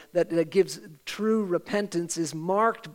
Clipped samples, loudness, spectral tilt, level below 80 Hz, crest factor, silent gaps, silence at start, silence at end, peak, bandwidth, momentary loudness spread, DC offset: under 0.1%; -27 LUFS; -5 dB/octave; -72 dBFS; 16 dB; none; 0 s; 0 s; -10 dBFS; 16.5 kHz; 6 LU; under 0.1%